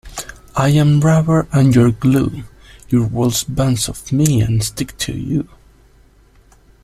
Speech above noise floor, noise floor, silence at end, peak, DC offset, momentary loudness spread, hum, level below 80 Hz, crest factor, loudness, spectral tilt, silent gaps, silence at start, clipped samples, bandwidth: 34 dB; -49 dBFS; 1.4 s; 0 dBFS; under 0.1%; 11 LU; none; -38 dBFS; 16 dB; -16 LUFS; -6 dB/octave; none; 0.05 s; under 0.1%; 14.5 kHz